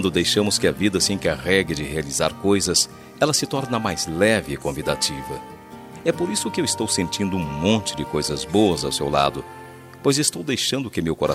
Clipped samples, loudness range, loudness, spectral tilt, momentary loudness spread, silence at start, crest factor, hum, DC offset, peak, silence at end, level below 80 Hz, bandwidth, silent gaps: under 0.1%; 3 LU; -21 LUFS; -3.5 dB/octave; 8 LU; 0 s; 18 dB; none; under 0.1%; -4 dBFS; 0 s; -48 dBFS; 16 kHz; none